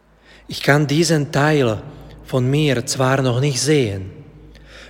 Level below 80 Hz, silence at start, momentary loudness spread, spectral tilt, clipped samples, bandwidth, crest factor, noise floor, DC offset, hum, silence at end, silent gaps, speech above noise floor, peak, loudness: -46 dBFS; 0.5 s; 13 LU; -5 dB/octave; under 0.1%; 16.5 kHz; 18 dB; -42 dBFS; under 0.1%; none; 0 s; none; 25 dB; 0 dBFS; -18 LUFS